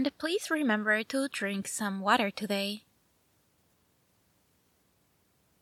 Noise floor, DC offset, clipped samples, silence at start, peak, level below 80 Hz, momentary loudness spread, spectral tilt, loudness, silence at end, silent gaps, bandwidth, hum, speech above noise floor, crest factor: -70 dBFS; under 0.1%; under 0.1%; 0 s; -10 dBFS; -78 dBFS; 6 LU; -3.5 dB/octave; -30 LUFS; 2.8 s; none; 17 kHz; none; 40 dB; 24 dB